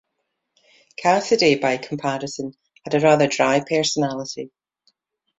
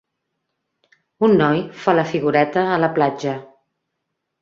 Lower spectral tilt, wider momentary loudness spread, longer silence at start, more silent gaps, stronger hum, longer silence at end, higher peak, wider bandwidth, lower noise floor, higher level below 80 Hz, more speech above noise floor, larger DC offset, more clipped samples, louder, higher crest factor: second, -4 dB/octave vs -7 dB/octave; first, 17 LU vs 8 LU; second, 1 s vs 1.2 s; neither; neither; about the same, 0.9 s vs 0.95 s; about the same, -2 dBFS vs -2 dBFS; first, 8.2 kHz vs 7.4 kHz; about the same, -76 dBFS vs -77 dBFS; about the same, -64 dBFS vs -62 dBFS; about the same, 57 dB vs 60 dB; neither; neither; about the same, -20 LUFS vs -18 LUFS; about the same, 20 dB vs 18 dB